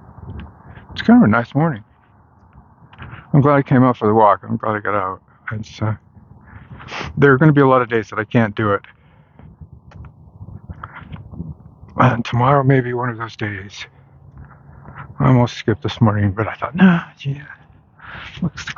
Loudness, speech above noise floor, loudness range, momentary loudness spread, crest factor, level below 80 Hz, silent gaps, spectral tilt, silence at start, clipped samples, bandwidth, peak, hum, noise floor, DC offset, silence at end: -16 LUFS; 36 dB; 6 LU; 22 LU; 18 dB; -46 dBFS; none; -8 dB/octave; 0.2 s; under 0.1%; 7 kHz; 0 dBFS; none; -51 dBFS; under 0.1%; 0.05 s